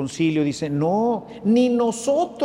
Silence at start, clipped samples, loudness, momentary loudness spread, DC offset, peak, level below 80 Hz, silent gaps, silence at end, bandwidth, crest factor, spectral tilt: 0 s; under 0.1%; -21 LUFS; 5 LU; under 0.1%; -8 dBFS; -58 dBFS; none; 0 s; 12 kHz; 12 dB; -6 dB/octave